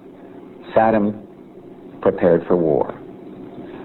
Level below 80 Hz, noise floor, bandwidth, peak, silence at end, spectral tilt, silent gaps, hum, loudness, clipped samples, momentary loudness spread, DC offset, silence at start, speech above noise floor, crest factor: -52 dBFS; -40 dBFS; 4.2 kHz; -2 dBFS; 0 s; -10.5 dB/octave; none; none; -18 LUFS; under 0.1%; 24 LU; under 0.1%; 0.05 s; 24 dB; 18 dB